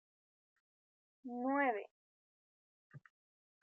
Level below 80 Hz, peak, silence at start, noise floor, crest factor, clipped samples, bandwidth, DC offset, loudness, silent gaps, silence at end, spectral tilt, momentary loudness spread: under -90 dBFS; -24 dBFS; 1.25 s; under -90 dBFS; 22 dB; under 0.1%; 3.9 kHz; under 0.1%; -38 LUFS; 1.91-2.90 s; 0.65 s; -4 dB/octave; 21 LU